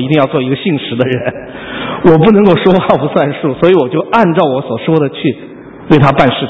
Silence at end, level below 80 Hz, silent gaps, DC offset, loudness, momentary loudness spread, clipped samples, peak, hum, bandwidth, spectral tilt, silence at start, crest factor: 0 s; -40 dBFS; none; under 0.1%; -11 LUFS; 13 LU; 0.8%; 0 dBFS; none; 8 kHz; -9 dB/octave; 0 s; 10 dB